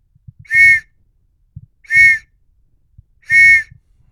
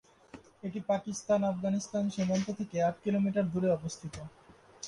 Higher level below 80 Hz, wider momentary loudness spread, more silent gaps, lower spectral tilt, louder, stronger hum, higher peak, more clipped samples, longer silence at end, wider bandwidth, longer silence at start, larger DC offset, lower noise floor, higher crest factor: first, -46 dBFS vs -64 dBFS; second, 8 LU vs 13 LU; neither; second, -1 dB/octave vs -6.5 dB/octave; first, -9 LUFS vs -32 LUFS; neither; first, 0 dBFS vs -18 dBFS; neither; first, 0.5 s vs 0 s; first, 16 kHz vs 11 kHz; first, 0.5 s vs 0.35 s; neither; about the same, -57 dBFS vs -55 dBFS; about the same, 14 dB vs 16 dB